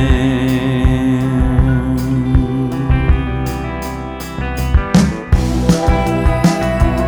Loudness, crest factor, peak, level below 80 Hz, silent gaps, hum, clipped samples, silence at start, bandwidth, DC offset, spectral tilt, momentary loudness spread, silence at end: -15 LUFS; 14 dB; 0 dBFS; -18 dBFS; none; none; under 0.1%; 0 s; over 20 kHz; under 0.1%; -7 dB/octave; 8 LU; 0 s